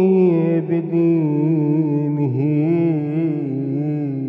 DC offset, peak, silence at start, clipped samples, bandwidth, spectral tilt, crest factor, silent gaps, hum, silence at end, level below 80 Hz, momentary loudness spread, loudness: under 0.1%; -6 dBFS; 0 s; under 0.1%; 3.6 kHz; -12.5 dB/octave; 12 dB; none; none; 0 s; -66 dBFS; 6 LU; -18 LUFS